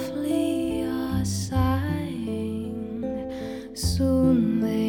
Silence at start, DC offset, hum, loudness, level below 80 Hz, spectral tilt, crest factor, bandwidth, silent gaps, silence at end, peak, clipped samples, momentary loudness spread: 0 s; under 0.1%; none; -26 LUFS; -40 dBFS; -6.5 dB/octave; 14 dB; 18 kHz; none; 0 s; -10 dBFS; under 0.1%; 11 LU